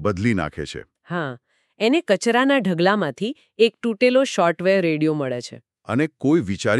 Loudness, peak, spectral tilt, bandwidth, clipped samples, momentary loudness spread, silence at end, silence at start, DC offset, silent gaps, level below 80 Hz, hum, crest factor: -20 LUFS; -4 dBFS; -5.5 dB/octave; 12 kHz; under 0.1%; 12 LU; 0 s; 0 s; under 0.1%; none; -54 dBFS; none; 16 dB